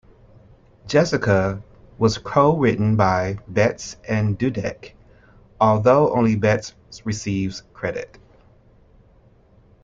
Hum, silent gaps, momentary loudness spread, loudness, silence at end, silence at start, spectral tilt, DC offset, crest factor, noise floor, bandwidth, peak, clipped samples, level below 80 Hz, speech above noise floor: none; none; 14 LU; -20 LUFS; 1.75 s; 0.85 s; -6.5 dB/octave; under 0.1%; 18 dB; -53 dBFS; 7.6 kHz; -2 dBFS; under 0.1%; -48 dBFS; 34 dB